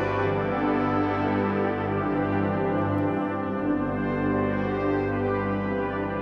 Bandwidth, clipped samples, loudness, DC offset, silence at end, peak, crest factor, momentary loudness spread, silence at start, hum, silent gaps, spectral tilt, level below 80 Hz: 6.2 kHz; under 0.1%; -26 LUFS; under 0.1%; 0 s; -12 dBFS; 12 dB; 3 LU; 0 s; 50 Hz at -40 dBFS; none; -9.5 dB/octave; -48 dBFS